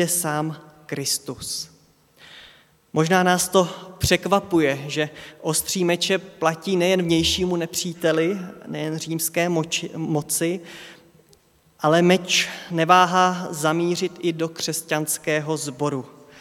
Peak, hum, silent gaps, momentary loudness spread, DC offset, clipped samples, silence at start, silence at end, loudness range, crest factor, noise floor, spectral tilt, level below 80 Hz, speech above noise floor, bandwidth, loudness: -2 dBFS; none; none; 11 LU; under 0.1%; under 0.1%; 0 s; 0 s; 5 LU; 22 dB; -57 dBFS; -4 dB/octave; -50 dBFS; 35 dB; 17 kHz; -22 LUFS